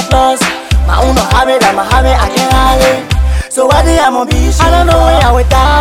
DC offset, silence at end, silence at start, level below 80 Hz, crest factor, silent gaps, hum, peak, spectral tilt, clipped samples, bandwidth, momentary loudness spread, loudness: 0.2%; 0 s; 0 s; -12 dBFS; 8 dB; none; none; 0 dBFS; -4.5 dB/octave; 0.2%; 15.5 kHz; 5 LU; -9 LUFS